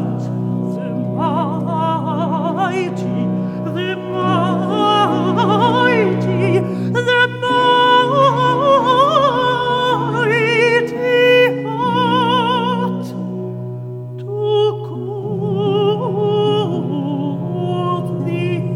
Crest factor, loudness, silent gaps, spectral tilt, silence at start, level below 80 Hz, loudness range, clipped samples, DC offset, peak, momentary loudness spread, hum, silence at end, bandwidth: 14 dB; -16 LUFS; none; -6.5 dB/octave; 0 s; -54 dBFS; 6 LU; under 0.1%; under 0.1%; -2 dBFS; 10 LU; none; 0 s; 12 kHz